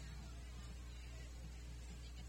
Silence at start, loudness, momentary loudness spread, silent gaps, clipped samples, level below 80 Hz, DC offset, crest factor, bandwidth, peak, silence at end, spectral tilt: 0 s; -54 LUFS; 0 LU; none; under 0.1%; -52 dBFS; under 0.1%; 10 dB; 16 kHz; -42 dBFS; 0 s; -4.5 dB/octave